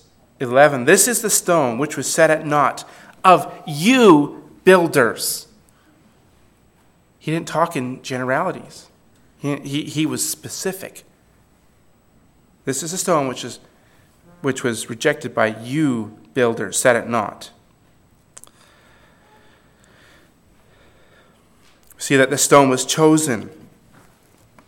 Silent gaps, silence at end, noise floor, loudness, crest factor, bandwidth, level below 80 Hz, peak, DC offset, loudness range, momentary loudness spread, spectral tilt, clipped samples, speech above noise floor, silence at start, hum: none; 1.15 s; -56 dBFS; -18 LUFS; 20 dB; 17.5 kHz; -62 dBFS; 0 dBFS; under 0.1%; 11 LU; 16 LU; -4 dB/octave; under 0.1%; 38 dB; 0.4 s; none